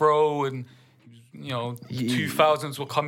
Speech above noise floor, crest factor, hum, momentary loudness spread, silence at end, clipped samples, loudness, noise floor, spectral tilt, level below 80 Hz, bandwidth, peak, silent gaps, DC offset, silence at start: 28 dB; 18 dB; none; 16 LU; 0 s; under 0.1%; -25 LUFS; -53 dBFS; -5.5 dB/octave; -74 dBFS; 17 kHz; -6 dBFS; none; under 0.1%; 0 s